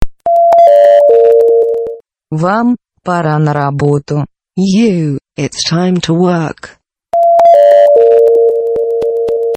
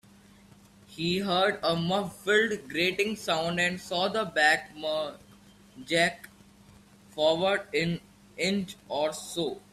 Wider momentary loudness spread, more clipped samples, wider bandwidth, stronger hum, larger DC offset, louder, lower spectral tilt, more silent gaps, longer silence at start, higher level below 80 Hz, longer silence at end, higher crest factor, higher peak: first, 13 LU vs 9 LU; first, 0.8% vs under 0.1%; second, 8.8 kHz vs 14.5 kHz; second, none vs 50 Hz at -55 dBFS; neither; first, -9 LUFS vs -28 LUFS; first, -6.5 dB/octave vs -4 dB/octave; neither; second, 0 s vs 0.9 s; first, -36 dBFS vs -64 dBFS; second, 0 s vs 0.15 s; second, 10 dB vs 20 dB; first, 0 dBFS vs -10 dBFS